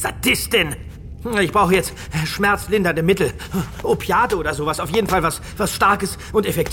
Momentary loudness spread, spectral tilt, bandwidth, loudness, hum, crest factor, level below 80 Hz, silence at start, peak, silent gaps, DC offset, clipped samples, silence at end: 8 LU; -4.5 dB/octave; 18 kHz; -19 LUFS; none; 18 dB; -36 dBFS; 0 s; -2 dBFS; none; under 0.1%; under 0.1%; 0 s